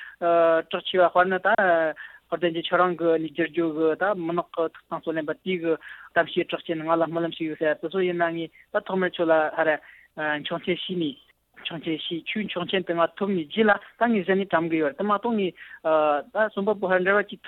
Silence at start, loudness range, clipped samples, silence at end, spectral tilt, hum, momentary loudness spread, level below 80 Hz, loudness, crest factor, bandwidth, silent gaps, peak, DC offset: 0 s; 4 LU; under 0.1%; 0 s; -8 dB/octave; none; 9 LU; -68 dBFS; -25 LUFS; 16 dB; 4.2 kHz; none; -8 dBFS; under 0.1%